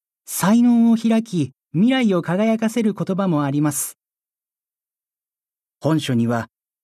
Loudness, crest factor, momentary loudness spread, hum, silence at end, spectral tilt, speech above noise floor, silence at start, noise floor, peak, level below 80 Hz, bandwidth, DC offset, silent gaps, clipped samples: -19 LUFS; 14 dB; 10 LU; none; 0.4 s; -6 dB/octave; over 72 dB; 0.3 s; under -90 dBFS; -6 dBFS; -66 dBFS; 14 kHz; under 0.1%; none; under 0.1%